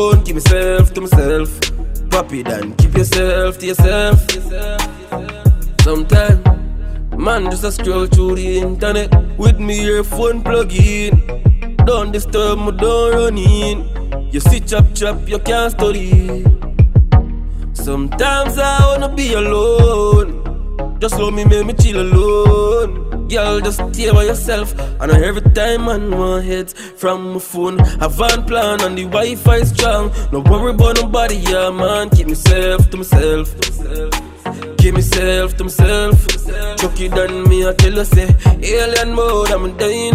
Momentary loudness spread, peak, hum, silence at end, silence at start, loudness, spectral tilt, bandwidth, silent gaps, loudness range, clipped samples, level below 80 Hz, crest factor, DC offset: 9 LU; 0 dBFS; none; 0 s; 0 s; -14 LUFS; -5.5 dB/octave; 16 kHz; none; 2 LU; under 0.1%; -16 dBFS; 12 dB; under 0.1%